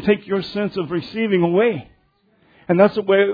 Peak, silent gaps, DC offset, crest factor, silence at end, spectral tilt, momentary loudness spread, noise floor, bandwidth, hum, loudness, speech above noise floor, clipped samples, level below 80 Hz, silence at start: -2 dBFS; none; under 0.1%; 18 dB; 0 s; -9 dB/octave; 9 LU; -60 dBFS; 5 kHz; none; -19 LUFS; 42 dB; under 0.1%; -56 dBFS; 0 s